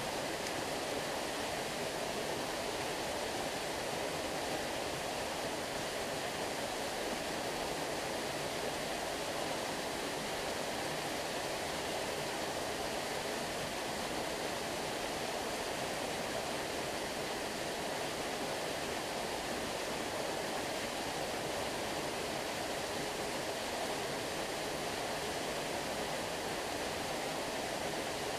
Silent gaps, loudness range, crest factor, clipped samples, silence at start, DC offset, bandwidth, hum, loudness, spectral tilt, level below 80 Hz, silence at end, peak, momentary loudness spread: none; 0 LU; 14 dB; under 0.1%; 0 s; under 0.1%; 15.5 kHz; none; -37 LUFS; -2.5 dB/octave; -60 dBFS; 0 s; -24 dBFS; 1 LU